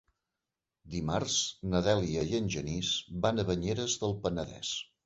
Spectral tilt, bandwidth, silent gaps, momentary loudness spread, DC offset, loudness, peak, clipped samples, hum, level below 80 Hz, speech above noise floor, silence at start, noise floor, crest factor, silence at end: -4 dB/octave; 8.2 kHz; none; 7 LU; under 0.1%; -32 LUFS; -12 dBFS; under 0.1%; none; -52 dBFS; 57 dB; 0.85 s; -89 dBFS; 20 dB; 0.2 s